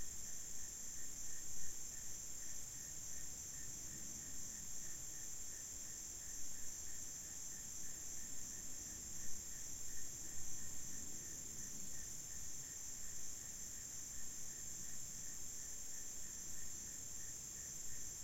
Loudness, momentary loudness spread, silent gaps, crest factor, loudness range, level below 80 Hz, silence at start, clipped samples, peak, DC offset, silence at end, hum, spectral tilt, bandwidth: -47 LUFS; 0 LU; none; 16 dB; 0 LU; -64 dBFS; 0 s; under 0.1%; -30 dBFS; 0.2%; 0 s; none; -1 dB/octave; 16.5 kHz